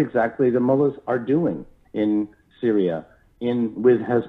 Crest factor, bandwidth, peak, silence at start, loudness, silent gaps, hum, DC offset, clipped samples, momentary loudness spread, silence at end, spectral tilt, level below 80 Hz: 16 dB; 4 kHz; -6 dBFS; 0 s; -22 LUFS; none; none; under 0.1%; under 0.1%; 12 LU; 0 s; -10 dB/octave; -58 dBFS